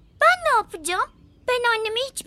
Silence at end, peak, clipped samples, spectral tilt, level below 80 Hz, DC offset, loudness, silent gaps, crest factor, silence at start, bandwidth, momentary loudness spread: 0.05 s; -4 dBFS; under 0.1%; -1 dB/octave; -56 dBFS; under 0.1%; -22 LUFS; none; 18 dB; 0.2 s; 16 kHz; 9 LU